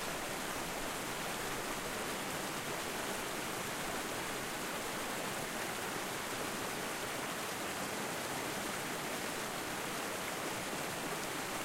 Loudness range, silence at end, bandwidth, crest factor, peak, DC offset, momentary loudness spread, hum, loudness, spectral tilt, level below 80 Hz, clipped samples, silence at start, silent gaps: 0 LU; 0 s; 16 kHz; 16 dB; -24 dBFS; under 0.1%; 1 LU; none; -38 LUFS; -2.5 dB/octave; -60 dBFS; under 0.1%; 0 s; none